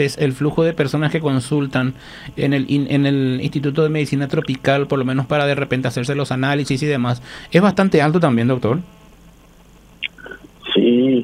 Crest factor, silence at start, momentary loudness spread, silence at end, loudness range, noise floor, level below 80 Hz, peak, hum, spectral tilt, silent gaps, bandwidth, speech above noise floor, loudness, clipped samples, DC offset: 18 dB; 0 s; 10 LU; 0 s; 2 LU; -46 dBFS; -48 dBFS; 0 dBFS; none; -7 dB/octave; none; 14 kHz; 29 dB; -18 LUFS; under 0.1%; under 0.1%